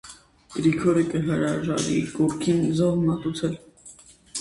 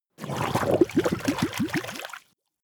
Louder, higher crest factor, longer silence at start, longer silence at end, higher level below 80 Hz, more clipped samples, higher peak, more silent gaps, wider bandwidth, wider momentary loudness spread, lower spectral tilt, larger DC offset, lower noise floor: about the same, -24 LUFS vs -26 LUFS; about the same, 16 dB vs 20 dB; second, 0.05 s vs 0.2 s; second, 0 s vs 0.45 s; about the same, -52 dBFS vs -56 dBFS; neither; about the same, -8 dBFS vs -6 dBFS; neither; second, 11.5 kHz vs over 20 kHz; second, 11 LU vs 14 LU; about the same, -6 dB/octave vs -5.5 dB/octave; neither; about the same, -49 dBFS vs -47 dBFS